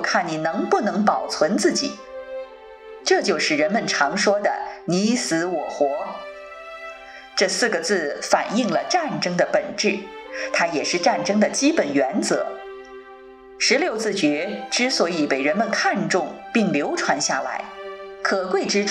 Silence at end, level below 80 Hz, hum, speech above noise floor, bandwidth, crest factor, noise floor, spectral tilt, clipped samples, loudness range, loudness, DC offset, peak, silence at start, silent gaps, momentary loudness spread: 0 s; -64 dBFS; none; 22 dB; 13 kHz; 18 dB; -43 dBFS; -3.5 dB/octave; under 0.1%; 2 LU; -21 LUFS; under 0.1%; -4 dBFS; 0 s; none; 16 LU